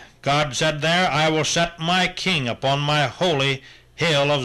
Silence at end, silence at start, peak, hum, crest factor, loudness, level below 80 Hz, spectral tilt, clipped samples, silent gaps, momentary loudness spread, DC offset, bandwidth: 0 s; 0 s; -10 dBFS; none; 12 dB; -20 LUFS; -48 dBFS; -4 dB/octave; under 0.1%; none; 4 LU; under 0.1%; 13 kHz